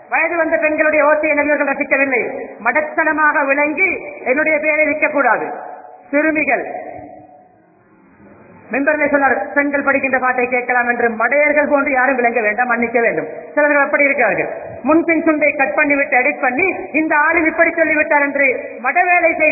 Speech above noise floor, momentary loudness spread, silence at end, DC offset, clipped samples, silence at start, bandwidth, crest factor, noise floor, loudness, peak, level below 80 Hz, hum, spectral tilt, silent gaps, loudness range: 35 dB; 7 LU; 0 s; under 0.1%; under 0.1%; 0.1 s; 2.7 kHz; 16 dB; -50 dBFS; -14 LUFS; 0 dBFS; -54 dBFS; none; -13.5 dB/octave; none; 5 LU